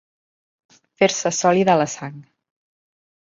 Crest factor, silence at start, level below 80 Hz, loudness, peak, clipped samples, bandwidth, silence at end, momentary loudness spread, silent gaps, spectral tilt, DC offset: 20 dB; 1 s; -66 dBFS; -18 LUFS; -2 dBFS; under 0.1%; 7.8 kHz; 1.05 s; 14 LU; none; -4 dB/octave; under 0.1%